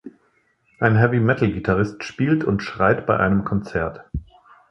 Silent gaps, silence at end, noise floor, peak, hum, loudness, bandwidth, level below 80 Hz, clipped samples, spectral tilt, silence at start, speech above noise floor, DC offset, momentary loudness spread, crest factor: none; 0.5 s; -63 dBFS; 0 dBFS; none; -20 LUFS; 7.4 kHz; -42 dBFS; under 0.1%; -8 dB/octave; 0.05 s; 44 dB; under 0.1%; 10 LU; 20 dB